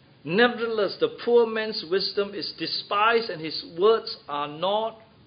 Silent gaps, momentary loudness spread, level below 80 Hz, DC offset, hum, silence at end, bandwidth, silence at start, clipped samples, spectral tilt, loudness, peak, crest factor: none; 10 LU; -70 dBFS; under 0.1%; none; 0.25 s; 5.2 kHz; 0.25 s; under 0.1%; -8.5 dB/octave; -25 LUFS; -6 dBFS; 20 dB